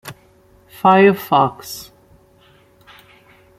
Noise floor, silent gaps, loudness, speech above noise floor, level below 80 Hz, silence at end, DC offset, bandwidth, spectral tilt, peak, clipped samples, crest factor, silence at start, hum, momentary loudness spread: -51 dBFS; none; -14 LUFS; 37 dB; -58 dBFS; 1.75 s; under 0.1%; 16 kHz; -6 dB/octave; 0 dBFS; under 0.1%; 18 dB; 0.05 s; none; 21 LU